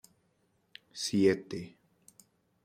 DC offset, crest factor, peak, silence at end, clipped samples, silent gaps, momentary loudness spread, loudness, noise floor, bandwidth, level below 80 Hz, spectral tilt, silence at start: under 0.1%; 22 dB; -14 dBFS; 0.95 s; under 0.1%; none; 21 LU; -31 LUFS; -73 dBFS; 15.5 kHz; -72 dBFS; -5 dB/octave; 0.95 s